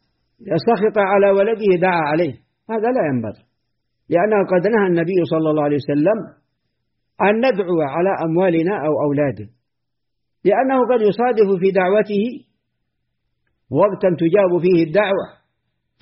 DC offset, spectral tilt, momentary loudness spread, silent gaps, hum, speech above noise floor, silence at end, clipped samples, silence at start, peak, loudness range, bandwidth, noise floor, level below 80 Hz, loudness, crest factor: under 0.1%; -6 dB/octave; 8 LU; none; none; 63 dB; 0.75 s; under 0.1%; 0.4 s; -4 dBFS; 1 LU; 5.8 kHz; -79 dBFS; -60 dBFS; -17 LUFS; 14 dB